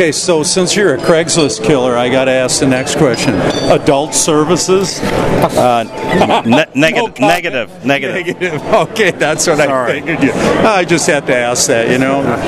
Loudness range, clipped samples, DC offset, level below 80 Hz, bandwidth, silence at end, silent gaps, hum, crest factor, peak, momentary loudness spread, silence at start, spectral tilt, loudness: 1 LU; 0.1%; under 0.1%; -38 dBFS; 15.5 kHz; 0 s; none; none; 12 dB; 0 dBFS; 4 LU; 0 s; -4 dB/octave; -11 LUFS